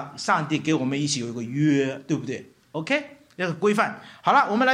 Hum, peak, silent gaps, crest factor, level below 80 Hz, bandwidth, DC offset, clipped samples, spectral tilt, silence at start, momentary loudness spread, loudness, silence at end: none; -6 dBFS; none; 18 dB; -70 dBFS; 12.5 kHz; under 0.1%; under 0.1%; -5 dB/octave; 0 s; 13 LU; -24 LUFS; 0 s